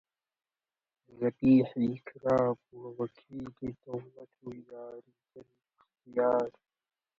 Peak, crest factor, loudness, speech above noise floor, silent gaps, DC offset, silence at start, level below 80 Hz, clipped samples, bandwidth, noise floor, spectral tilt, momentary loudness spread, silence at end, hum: -14 dBFS; 20 dB; -31 LUFS; over 58 dB; none; under 0.1%; 1.15 s; -66 dBFS; under 0.1%; 6.6 kHz; under -90 dBFS; -9.5 dB/octave; 22 LU; 0.7 s; none